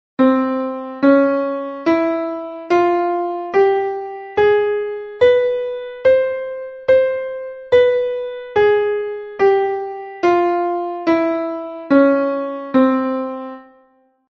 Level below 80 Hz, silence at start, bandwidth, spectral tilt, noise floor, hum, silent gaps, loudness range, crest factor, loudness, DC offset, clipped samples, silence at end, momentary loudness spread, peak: -56 dBFS; 0.2 s; 6.6 kHz; -6.5 dB/octave; -56 dBFS; none; none; 1 LU; 16 dB; -17 LUFS; under 0.1%; under 0.1%; 0.7 s; 12 LU; -2 dBFS